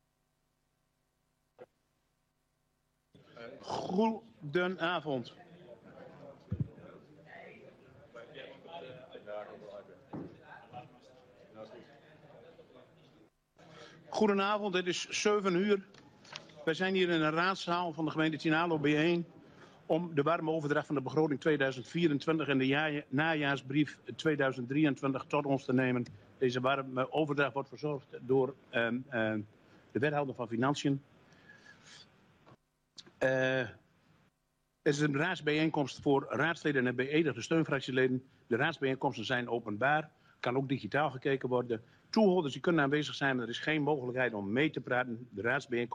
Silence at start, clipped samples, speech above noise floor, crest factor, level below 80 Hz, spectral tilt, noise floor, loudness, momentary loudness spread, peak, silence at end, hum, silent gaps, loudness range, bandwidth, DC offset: 1.6 s; under 0.1%; 47 dB; 16 dB; -72 dBFS; -5.5 dB/octave; -79 dBFS; -33 LUFS; 19 LU; -18 dBFS; 0 s; none; none; 16 LU; 10 kHz; under 0.1%